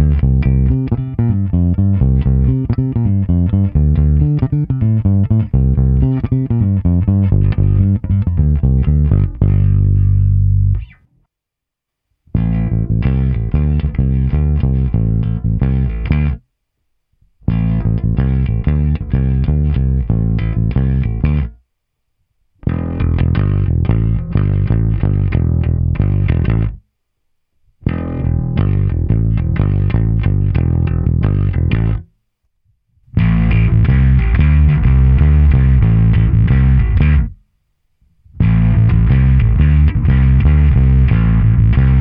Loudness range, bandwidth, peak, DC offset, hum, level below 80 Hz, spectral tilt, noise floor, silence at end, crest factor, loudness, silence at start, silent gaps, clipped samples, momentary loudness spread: 6 LU; 3.8 kHz; 0 dBFS; under 0.1%; none; -18 dBFS; -12.5 dB/octave; -81 dBFS; 0 s; 12 dB; -14 LUFS; 0 s; none; under 0.1%; 6 LU